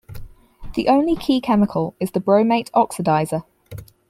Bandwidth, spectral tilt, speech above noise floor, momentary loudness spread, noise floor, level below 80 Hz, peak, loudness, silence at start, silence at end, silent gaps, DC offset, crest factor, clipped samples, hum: 15.5 kHz; -6.5 dB/octave; 20 dB; 12 LU; -38 dBFS; -44 dBFS; -4 dBFS; -19 LUFS; 0.1 s; 0.25 s; none; under 0.1%; 16 dB; under 0.1%; none